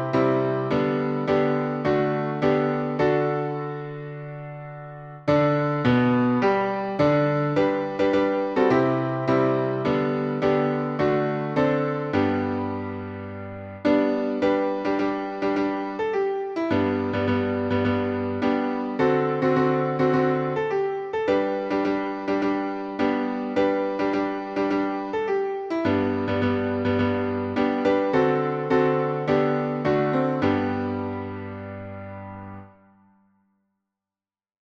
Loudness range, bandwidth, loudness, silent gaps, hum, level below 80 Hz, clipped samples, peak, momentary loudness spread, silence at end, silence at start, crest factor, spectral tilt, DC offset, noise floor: 4 LU; 7.2 kHz; -24 LUFS; none; none; -56 dBFS; under 0.1%; -8 dBFS; 11 LU; 2.1 s; 0 s; 16 dB; -8 dB/octave; under 0.1%; under -90 dBFS